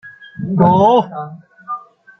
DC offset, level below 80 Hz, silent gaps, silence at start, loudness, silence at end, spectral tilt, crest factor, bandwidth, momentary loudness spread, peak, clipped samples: under 0.1%; -54 dBFS; none; 0.05 s; -13 LUFS; 0.4 s; -9 dB/octave; 14 dB; 6.4 kHz; 20 LU; -2 dBFS; under 0.1%